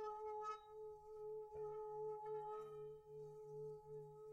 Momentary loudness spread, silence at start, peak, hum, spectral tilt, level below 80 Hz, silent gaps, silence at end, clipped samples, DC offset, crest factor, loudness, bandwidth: 8 LU; 0 s; -40 dBFS; none; -6.5 dB/octave; -80 dBFS; none; 0 s; under 0.1%; under 0.1%; 12 dB; -52 LUFS; 8.6 kHz